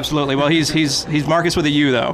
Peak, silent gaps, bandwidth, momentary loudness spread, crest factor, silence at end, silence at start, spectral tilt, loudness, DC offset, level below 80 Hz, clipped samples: -4 dBFS; none; 15 kHz; 2 LU; 12 dB; 0 s; 0 s; -4.5 dB/octave; -16 LUFS; under 0.1%; -42 dBFS; under 0.1%